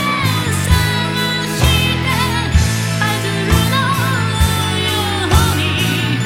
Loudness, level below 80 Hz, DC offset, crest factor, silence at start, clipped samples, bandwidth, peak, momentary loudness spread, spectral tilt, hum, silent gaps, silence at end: -15 LUFS; -26 dBFS; under 0.1%; 14 dB; 0 s; under 0.1%; 16.5 kHz; 0 dBFS; 3 LU; -4.5 dB/octave; none; none; 0 s